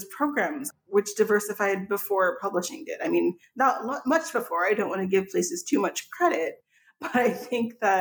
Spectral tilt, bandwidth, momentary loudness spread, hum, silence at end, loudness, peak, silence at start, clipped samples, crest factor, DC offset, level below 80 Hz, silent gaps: -4 dB/octave; over 20 kHz; 6 LU; none; 0 s; -26 LUFS; -10 dBFS; 0 s; under 0.1%; 16 dB; under 0.1%; -76 dBFS; none